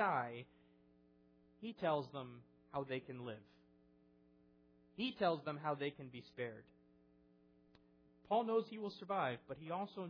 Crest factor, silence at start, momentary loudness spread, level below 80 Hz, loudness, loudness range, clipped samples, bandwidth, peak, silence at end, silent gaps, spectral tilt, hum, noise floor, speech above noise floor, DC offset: 20 dB; 0 s; 16 LU; -82 dBFS; -43 LUFS; 3 LU; under 0.1%; 5.4 kHz; -24 dBFS; 0 s; none; -4 dB/octave; none; -71 dBFS; 28 dB; under 0.1%